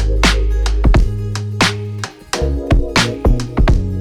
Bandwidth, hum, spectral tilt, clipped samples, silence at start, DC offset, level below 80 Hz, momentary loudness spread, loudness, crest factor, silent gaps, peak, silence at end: 13 kHz; none; -5 dB/octave; under 0.1%; 0 s; 0.6%; -16 dBFS; 8 LU; -16 LUFS; 14 dB; none; 0 dBFS; 0 s